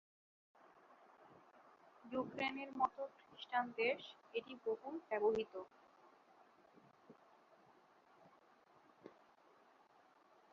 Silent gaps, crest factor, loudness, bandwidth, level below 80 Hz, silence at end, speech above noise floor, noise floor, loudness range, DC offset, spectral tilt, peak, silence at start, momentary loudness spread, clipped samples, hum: none; 24 dB; -43 LUFS; 7 kHz; -86 dBFS; 1.4 s; 28 dB; -70 dBFS; 5 LU; under 0.1%; -1.5 dB/octave; -24 dBFS; 0.9 s; 27 LU; under 0.1%; none